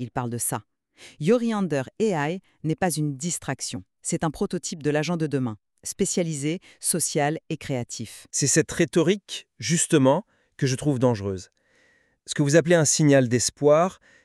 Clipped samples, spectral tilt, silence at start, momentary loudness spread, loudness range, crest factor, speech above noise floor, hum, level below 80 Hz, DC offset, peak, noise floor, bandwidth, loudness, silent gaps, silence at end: under 0.1%; -4.5 dB/octave; 0 s; 12 LU; 5 LU; 20 dB; 39 dB; none; -58 dBFS; under 0.1%; -6 dBFS; -63 dBFS; 13.5 kHz; -24 LUFS; none; 0.3 s